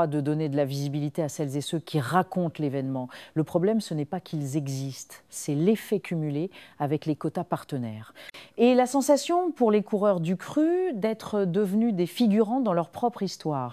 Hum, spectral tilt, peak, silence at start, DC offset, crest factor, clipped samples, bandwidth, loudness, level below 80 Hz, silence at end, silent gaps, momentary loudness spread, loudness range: none; -6.5 dB/octave; -6 dBFS; 0 s; under 0.1%; 20 dB; under 0.1%; 15.5 kHz; -27 LUFS; -72 dBFS; 0 s; none; 11 LU; 5 LU